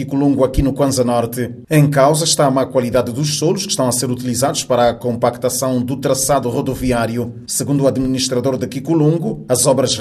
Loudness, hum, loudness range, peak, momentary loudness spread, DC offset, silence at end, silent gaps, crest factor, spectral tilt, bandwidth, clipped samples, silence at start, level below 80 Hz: -16 LUFS; none; 2 LU; 0 dBFS; 6 LU; under 0.1%; 0 s; none; 16 dB; -5 dB/octave; 13.5 kHz; under 0.1%; 0 s; -36 dBFS